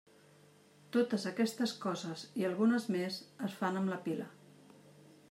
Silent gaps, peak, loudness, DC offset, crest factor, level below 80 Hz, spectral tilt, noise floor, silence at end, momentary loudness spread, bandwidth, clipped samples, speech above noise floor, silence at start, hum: none; -20 dBFS; -36 LUFS; under 0.1%; 16 dB; -88 dBFS; -5.5 dB/octave; -63 dBFS; 0.4 s; 10 LU; 15.5 kHz; under 0.1%; 28 dB; 0.95 s; none